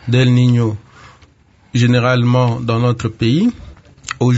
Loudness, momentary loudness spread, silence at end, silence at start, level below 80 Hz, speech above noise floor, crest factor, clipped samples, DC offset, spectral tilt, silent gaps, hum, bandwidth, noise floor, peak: -15 LUFS; 10 LU; 0 s; 0.05 s; -44 dBFS; 35 dB; 14 dB; under 0.1%; under 0.1%; -7 dB/octave; none; none; 8 kHz; -49 dBFS; 0 dBFS